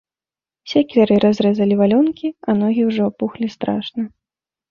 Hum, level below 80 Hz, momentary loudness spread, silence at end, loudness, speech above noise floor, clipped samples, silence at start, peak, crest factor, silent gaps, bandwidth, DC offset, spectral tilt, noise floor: none; -58 dBFS; 10 LU; 0.65 s; -17 LUFS; over 73 dB; under 0.1%; 0.65 s; -2 dBFS; 16 dB; none; 7 kHz; under 0.1%; -8 dB/octave; under -90 dBFS